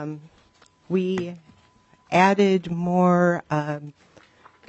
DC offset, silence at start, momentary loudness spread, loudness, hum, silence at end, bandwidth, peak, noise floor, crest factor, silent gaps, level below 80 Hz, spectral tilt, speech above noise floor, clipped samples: under 0.1%; 0 s; 17 LU; -22 LUFS; none; 0.75 s; 8.2 kHz; -4 dBFS; -58 dBFS; 18 dB; none; -62 dBFS; -7 dB/octave; 36 dB; under 0.1%